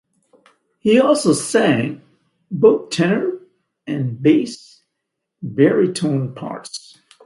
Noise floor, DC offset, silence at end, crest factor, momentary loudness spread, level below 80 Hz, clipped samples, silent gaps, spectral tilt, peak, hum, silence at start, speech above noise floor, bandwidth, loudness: -78 dBFS; under 0.1%; 0.45 s; 18 dB; 18 LU; -62 dBFS; under 0.1%; none; -5.5 dB/octave; 0 dBFS; none; 0.85 s; 61 dB; 11.5 kHz; -17 LUFS